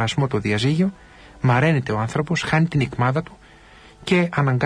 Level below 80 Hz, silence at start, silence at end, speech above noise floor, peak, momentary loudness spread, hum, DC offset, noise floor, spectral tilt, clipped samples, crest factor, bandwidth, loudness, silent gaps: -48 dBFS; 0 s; 0 s; 27 dB; -6 dBFS; 6 LU; none; under 0.1%; -47 dBFS; -6.5 dB/octave; under 0.1%; 14 dB; 10.5 kHz; -21 LUFS; none